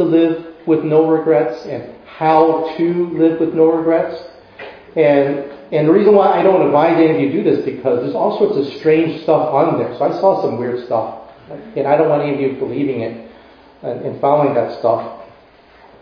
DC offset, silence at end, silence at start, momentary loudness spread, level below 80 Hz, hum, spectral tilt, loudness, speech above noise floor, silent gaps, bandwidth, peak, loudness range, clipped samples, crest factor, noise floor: under 0.1%; 0.75 s; 0 s; 15 LU; -58 dBFS; none; -9.5 dB/octave; -15 LUFS; 31 dB; none; 5.4 kHz; 0 dBFS; 6 LU; under 0.1%; 16 dB; -46 dBFS